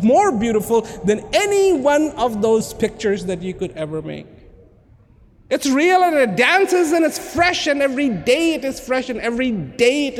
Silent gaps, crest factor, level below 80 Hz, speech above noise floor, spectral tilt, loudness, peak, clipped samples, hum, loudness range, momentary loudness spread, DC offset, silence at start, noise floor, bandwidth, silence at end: none; 16 dB; -46 dBFS; 32 dB; -4 dB/octave; -18 LUFS; -2 dBFS; under 0.1%; none; 7 LU; 11 LU; under 0.1%; 0 s; -50 dBFS; 17 kHz; 0 s